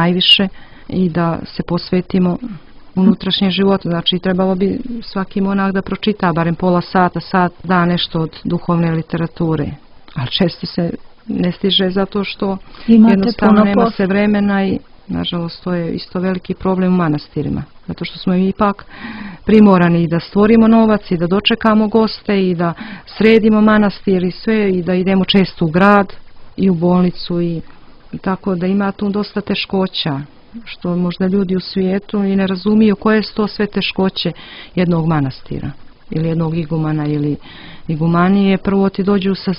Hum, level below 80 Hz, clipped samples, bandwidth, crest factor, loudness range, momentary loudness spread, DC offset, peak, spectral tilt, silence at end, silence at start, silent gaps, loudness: none; -40 dBFS; under 0.1%; 5.6 kHz; 14 dB; 6 LU; 14 LU; under 0.1%; 0 dBFS; -9 dB/octave; 0 s; 0 s; none; -15 LUFS